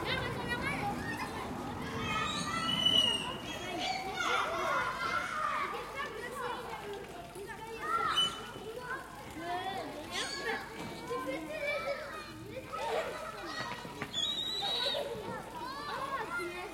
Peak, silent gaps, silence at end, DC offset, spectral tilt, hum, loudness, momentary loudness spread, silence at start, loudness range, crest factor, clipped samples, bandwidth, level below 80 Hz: -16 dBFS; none; 0 s; under 0.1%; -3 dB/octave; none; -35 LUFS; 12 LU; 0 s; 7 LU; 20 dB; under 0.1%; 16.5 kHz; -60 dBFS